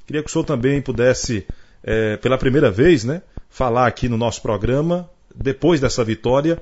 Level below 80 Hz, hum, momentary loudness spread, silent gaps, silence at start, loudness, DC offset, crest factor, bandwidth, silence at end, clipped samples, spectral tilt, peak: -34 dBFS; none; 10 LU; none; 0 s; -19 LUFS; under 0.1%; 16 dB; 8 kHz; 0 s; under 0.1%; -6 dB/octave; -2 dBFS